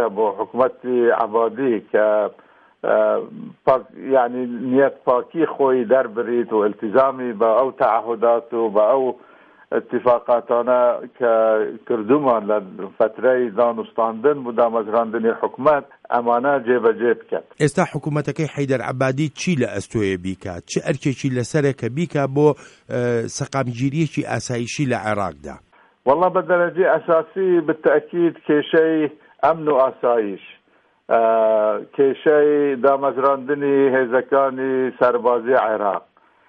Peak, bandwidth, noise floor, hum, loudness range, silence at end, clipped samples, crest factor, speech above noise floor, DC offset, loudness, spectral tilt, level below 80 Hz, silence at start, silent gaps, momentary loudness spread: -4 dBFS; 11 kHz; -59 dBFS; none; 4 LU; 0.5 s; under 0.1%; 16 dB; 41 dB; under 0.1%; -19 LUFS; -6.5 dB/octave; -60 dBFS; 0 s; none; 7 LU